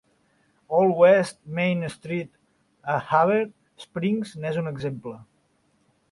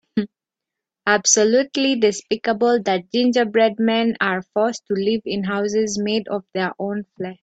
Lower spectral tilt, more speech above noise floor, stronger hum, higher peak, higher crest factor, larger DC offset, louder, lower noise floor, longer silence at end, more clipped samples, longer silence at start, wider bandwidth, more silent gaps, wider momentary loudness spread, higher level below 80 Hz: first, -7 dB/octave vs -3 dB/octave; second, 44 dB vs 66 dB; neither; second, -6 dBFS vs -2 dBFS; about the same, 20 dB vs 18 dB; neither; second, -23 LUFS vs -20 LUFS; second, -66 dBFS vs -85 dBFS; first, 0.9 s vs 0.1 s; neither; first, 0.7 s vs 0.15 s; first, 11.5 kHz vs 9.2 kHz; neither; first, 19 LU vs 10 LU; about the same, -64 dBFS vs -64 dBFS